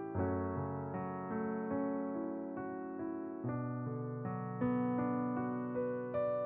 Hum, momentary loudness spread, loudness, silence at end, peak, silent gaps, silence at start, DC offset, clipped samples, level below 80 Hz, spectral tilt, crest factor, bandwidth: none; 7 LU; -39 LUFS; 0 s; -24 dBFS; none; 0 s; under 0.1%; under 0.1%; -68 dBFS; -10 dB/octave; 14 dB; 3.8 kHz